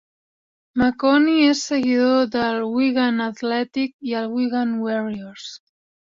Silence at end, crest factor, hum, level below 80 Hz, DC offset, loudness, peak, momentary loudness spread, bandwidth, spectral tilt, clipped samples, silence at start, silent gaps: 0.45 s; 16 dB; none; -56 dBFS; under 0.1%; -20 LUFS; -6 dBFS; 13 LU; 7.6 kHz; -4.5 dB/octave; under 0.1%; 0.75 s; 3.93-3.99 s